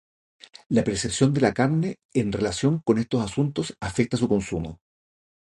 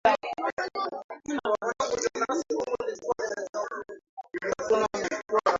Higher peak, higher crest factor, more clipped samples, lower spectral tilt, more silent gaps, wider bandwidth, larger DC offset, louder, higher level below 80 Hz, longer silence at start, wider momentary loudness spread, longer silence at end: about the same, -6 dBFS vs -8 dBFS; about the same, 20 dB vs 20 dB; neither; first, -6 dB/octave vs -3 dB/octave; second, 2.05-2.09 s vs 0.52-0.57 s, 1.04-1.09 s, 3.49-3.53 s, 4.09-4.17 s; first, 11.5 kHz vs 7.8 kHz; neither; first, -24 LUFS vs -30 LUFS; first, -48 dBFS vs -64 dBFS; first, 0.7 s vs 0.05 s; second, 7 LU vs 10 LU; first, 0.75 s vs 0 s